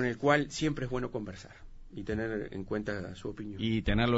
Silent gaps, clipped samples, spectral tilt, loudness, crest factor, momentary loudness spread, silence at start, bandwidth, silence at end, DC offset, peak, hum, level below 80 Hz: none; under 0.1%; -6 dB/octave; -33 LUFS; 20 dB; 16 LU; 0 s; 8 kHz; 0 s; under 0.1%; -12 dBFS; none; -46 dBFS